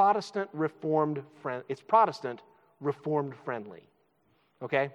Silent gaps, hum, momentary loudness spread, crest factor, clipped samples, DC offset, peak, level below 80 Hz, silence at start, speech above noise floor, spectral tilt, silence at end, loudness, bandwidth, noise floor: none; none; 15 LU; 20 dB; under 0.1%; under 0.1%; -10 dBFS; -88 dBFS; 0 s; 40 dB; -7 dB/octave; 0.05 s; -31 LUFS; 10.5 kHz; -70 dBFS